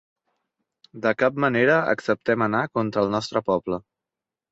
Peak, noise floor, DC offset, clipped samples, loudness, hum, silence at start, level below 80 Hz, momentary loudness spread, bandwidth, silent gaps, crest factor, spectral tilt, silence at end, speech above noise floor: -6 dBFS; -88 dBFS; under 0.1%; under 0.1%; -23 LUFS; none; 0.95 s; -60 dBFS; 7 LU; 8 kHz; none; 18 dB; -6.5 dB/octave; 0.7 s; 66 dB